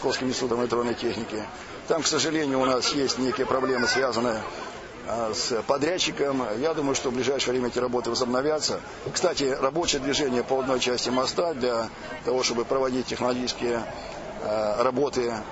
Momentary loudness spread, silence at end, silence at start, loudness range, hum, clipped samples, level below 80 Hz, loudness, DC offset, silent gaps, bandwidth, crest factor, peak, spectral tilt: 9 LU; 0 s; 0 s; 2 LU; none; under 0.1%; -52 dBFS; -26 LUFS; under 0.1%; none; 8 kHz; 16 dB; -10 dBFS; -3 dB/octave